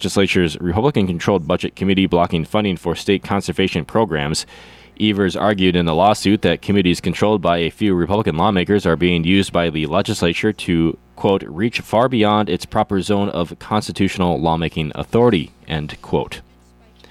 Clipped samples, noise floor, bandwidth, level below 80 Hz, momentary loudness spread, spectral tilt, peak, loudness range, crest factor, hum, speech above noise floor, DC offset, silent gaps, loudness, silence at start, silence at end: under 0.1%; -49 dBFS; 14 kHz; -44 dBFS; 7 LU; -6 dB/octave; -2 dBFS; 3 LU; 14 dB; none; 32 dB; under 0.1%; none; -18 LUFS; 0 s; 0.7 s